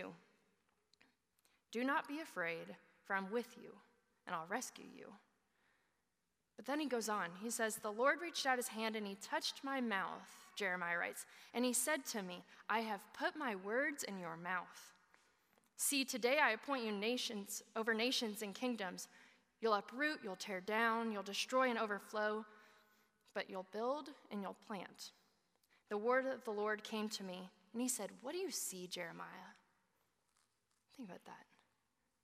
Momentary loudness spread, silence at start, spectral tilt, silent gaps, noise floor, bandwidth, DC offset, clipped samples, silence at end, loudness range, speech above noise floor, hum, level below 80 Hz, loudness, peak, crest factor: 17 LU; 0 s; -2.5 dB/octave; none; -87 dBFS; 15.5 kHz; under 0.1%; under 0.1%; 0.8 s; 8 LU; 45 dB; none; under -90 dBFS; -41 LUFS; -20 dBFS; 22 dB